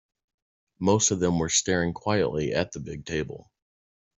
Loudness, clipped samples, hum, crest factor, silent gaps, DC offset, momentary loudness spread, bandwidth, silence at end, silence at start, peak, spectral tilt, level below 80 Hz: -25 LUFS; under 0.1%; none; 20 dB; none; under 0.1%; 12 LU; 8.2 kHz; 0.75 s; 0.8 s; -8 dBFS; -4 dB/octave; -54 dBFS